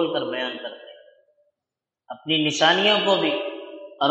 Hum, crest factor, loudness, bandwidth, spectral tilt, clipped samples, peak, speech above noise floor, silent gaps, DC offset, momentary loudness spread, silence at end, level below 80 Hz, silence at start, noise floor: none; 20 dB; -21 LUFS; 8.6 kHz; -3.5 dB/octave; under 0.1%; -4 dBFS; 65 dB; none; under 0.1%; 21 LU; 0 s; -78 dBFS; 0 s; -87 dBFS